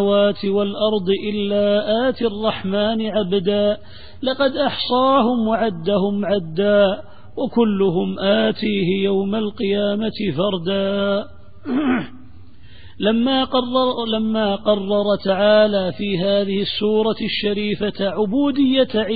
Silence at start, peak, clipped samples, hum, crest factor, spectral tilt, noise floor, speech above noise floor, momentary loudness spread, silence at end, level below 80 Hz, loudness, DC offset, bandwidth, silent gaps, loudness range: 0 s; -4 dBFS; under 0.1%; none; 14 dB; -11 dB/octave; -45 dBFS; 26 dB; 6 LU; 0 s; -50 dBFS; -19 LUFS; 1%; 4.9 kHz; none; 3 LU